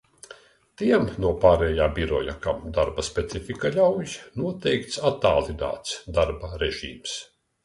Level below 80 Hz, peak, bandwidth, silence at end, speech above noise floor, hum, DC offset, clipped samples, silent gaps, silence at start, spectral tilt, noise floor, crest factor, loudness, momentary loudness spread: -40 dBFS; -2 dBFS; 11.5 kHz; 0.4 s; 26 dB; none; under 0.1%; under 0.1%; none; 0.3 s; -5 dB/octave; -50 dBFS; 22 dB; -25 LUFS; 11 LU